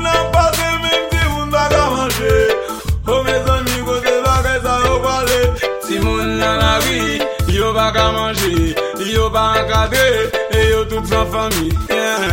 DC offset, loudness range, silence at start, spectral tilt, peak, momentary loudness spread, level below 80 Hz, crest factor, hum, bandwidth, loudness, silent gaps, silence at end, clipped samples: 0.3%; 1 LU; 0 s; -4.5 dB/octave; 0 dBFS; 4 LU; -24 dBFS; 14 dB; none; 17 kHz; -15 LUFS; none; 0 s; under 0.1%